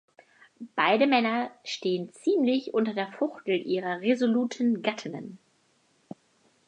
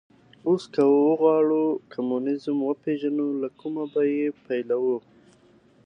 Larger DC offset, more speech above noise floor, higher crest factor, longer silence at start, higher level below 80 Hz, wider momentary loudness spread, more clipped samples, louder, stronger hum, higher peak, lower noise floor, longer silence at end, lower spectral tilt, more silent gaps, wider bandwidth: neither; first, 41 dB vs 34 dB; about the same, 20 dB vs 16 dB; first, 0.6 s vs 0.45 s; second, -82 dBFS vs -76 dBFS; first, 21 LU vs 11 LU; neither; second, -27 LUFS vs -24 LUFS; neither; about the same, -8 dBFS vs -8 dBFS; first, -67 dBFS vs -57 dBFS; first, 1.3 s vs 0.85 s; second, -5 dB/octave vs -8 dB/octave; neither; about the same, 9.6 kHz vs 9.2 kHz